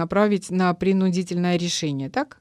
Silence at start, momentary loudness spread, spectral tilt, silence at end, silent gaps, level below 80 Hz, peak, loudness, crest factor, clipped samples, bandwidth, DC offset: 0 s; 5 LU; -5.5 dB/octave; 0.15 s; none; -56 dBFS; -8 dBFS; -22 LUFS; 14 dB; under 0.1%; 12 kHz; under 0.1%